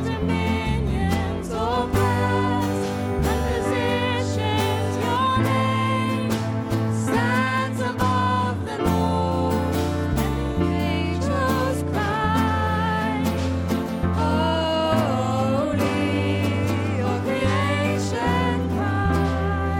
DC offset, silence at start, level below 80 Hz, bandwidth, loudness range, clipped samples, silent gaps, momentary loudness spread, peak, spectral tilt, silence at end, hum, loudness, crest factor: under 0.1%; 0 s; -36 dBFS; 17 kHz; 1 LU; under 0.1%; none; 3 LU; -8 dBFS; -6.5 dB/octave; 0 s; none; -23 LUFS; 14 dB